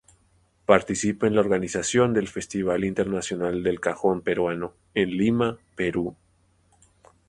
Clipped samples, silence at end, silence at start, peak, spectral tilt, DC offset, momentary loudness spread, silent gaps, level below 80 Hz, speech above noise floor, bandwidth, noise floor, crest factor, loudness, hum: under 0.1%; 1.15 s; 0.7 s; 0 dBFS; -5 dB/octave; under 0.1%; 8 LU; none; -54 dBFS; 40 dB; 11.5 kHz; -64 dBFS; 24 dB; -25 LUFS; none